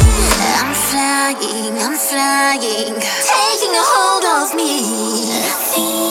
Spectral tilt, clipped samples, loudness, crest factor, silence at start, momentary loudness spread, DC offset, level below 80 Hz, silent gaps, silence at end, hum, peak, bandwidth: -3 dB/octave; under 0.1%; -14 LUFS; 14 dB; 0 s; 5 LU; under 0.1%; -26 dBFS; none; 0 s; none; 0 dBFS; 18 kHz